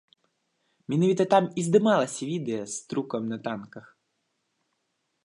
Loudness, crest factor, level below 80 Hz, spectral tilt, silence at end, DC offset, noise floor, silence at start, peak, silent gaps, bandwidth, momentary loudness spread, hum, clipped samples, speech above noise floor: -26 LUFS; 20 dB; -76 dBFS; -5.5 dB/octave; 1.45 s; under 0.1%; -77 dBFS; 0.9 s; -8 dBFS; none; 11.5 kHz; 13 LU; none; under 0.1%; 52 dB